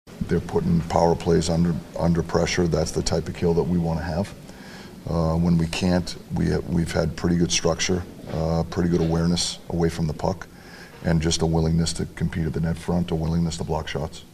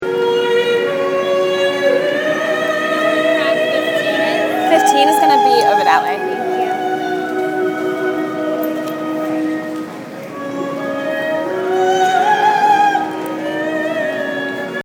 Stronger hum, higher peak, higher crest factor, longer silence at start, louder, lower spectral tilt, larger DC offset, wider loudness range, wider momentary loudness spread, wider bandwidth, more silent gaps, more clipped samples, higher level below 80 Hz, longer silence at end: neither; second, -4 dBFS vs 0 dBFS; about the same, 20 dB vs 16 dB; about the same, 0.05 s vs 0 s; second, -24 LUFS vs -16 LUFS; first, -5.5 dB/octave vs -4 dB/octave; neither; second, 2 LU vs 7 LU; about the same, 9 LU vs 10 LU; second, 13.5 kHz vs over 20 kHz; neither; neither; first, -38 dBFS vs -68 dBFS; about the same, 0.05 s vs 0 s